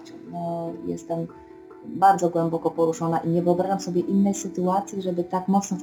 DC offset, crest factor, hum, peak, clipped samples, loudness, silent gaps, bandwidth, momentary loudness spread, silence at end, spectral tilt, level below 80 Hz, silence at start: under 0.1%; 18 dB; none; -6 dBFS; under 0.1%; -24 LUFS; none; 18 kHz; 12 LU; 0 s; -6.5 dB/octave; -64 dBFS; 0 s